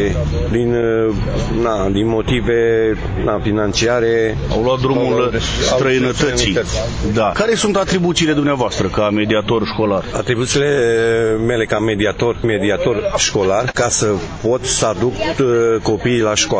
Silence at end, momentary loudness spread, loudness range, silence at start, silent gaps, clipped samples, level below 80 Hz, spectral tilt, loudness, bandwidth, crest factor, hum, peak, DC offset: 0 s; 4 LU; 1 LU; 0 s; none; under 0.1%; -30 dBFS; -4.5 dB/octave; -16 LUFS; 8 kHz; 14 dB; none; -2 dBFS; under 0.1%